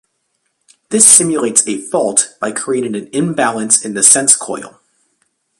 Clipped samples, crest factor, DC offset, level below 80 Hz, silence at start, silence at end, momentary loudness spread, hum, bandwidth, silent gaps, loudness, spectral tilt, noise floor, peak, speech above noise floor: 0.4%; 14 dB; under 0.1%; -60 dBFS; 0.9 s; 0.9 s; 14 LU; none; 16 kHz; none; -11 LUFS; -2 dB/octave; -67 dBFS; 0 dBFS; 54 dB